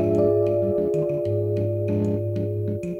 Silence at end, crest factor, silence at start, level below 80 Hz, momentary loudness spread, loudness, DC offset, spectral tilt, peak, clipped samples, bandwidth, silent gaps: 0 s; 14 dB; 0 s; -54 dBFS; 6 LU; -23 LUFS; under 0.1%; -10.5 dB/octave; -10 dBFS; under 0.1%; 7.4 kHz; none